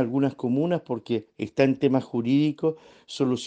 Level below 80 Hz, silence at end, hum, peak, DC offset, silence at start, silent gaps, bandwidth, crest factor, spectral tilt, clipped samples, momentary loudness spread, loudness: -68 dBFS; 0 s; none; -6 dBFS; under 0.1%; 0 s; none; 9 kHz; 18 dB; -7 dB/octave; under 0.1%; 8 LU; -25 LUFS